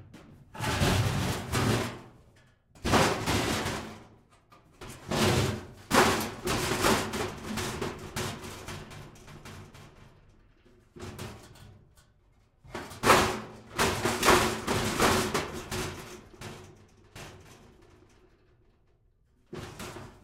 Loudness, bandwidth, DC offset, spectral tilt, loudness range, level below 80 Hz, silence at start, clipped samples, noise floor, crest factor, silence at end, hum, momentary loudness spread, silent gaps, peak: -28 LUFS; 16 kHz; under 0.1%; -4 dB/octave; 21 LU; -48 dBFS; 0 s; under 0.1%; -66 dBFS; 24 dB; 0.1 s; none; 23 LU; none; -8 dBFS